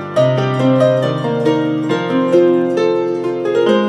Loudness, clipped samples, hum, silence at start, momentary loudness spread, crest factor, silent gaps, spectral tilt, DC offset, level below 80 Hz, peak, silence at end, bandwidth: -15 LUFS; under 0.1%; none; 0 s; 5 LU; 12 dB; none; -7.5 dB/octave; under 0.1%; -68 dBFS; -2 dBFS; 0 s; 10.5 kHz